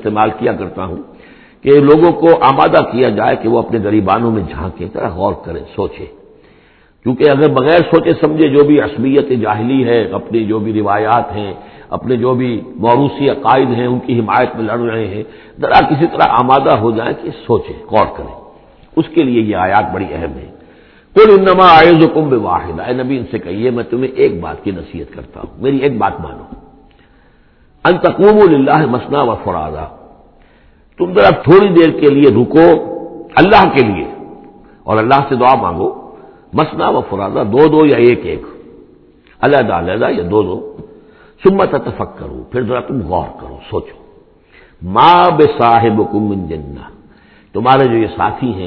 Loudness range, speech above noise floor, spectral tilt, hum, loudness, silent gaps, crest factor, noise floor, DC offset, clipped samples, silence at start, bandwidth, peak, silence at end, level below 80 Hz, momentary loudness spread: 8 LU; 36 dB; -9.5 dB/octave; none; -11 LUFS; none; 12 dB; -47 dBFS; under 0.1%; 0.5%; 0 s; 5.4 kHz; 0 dBFS; 0 s; -40 dBFS; 17 LU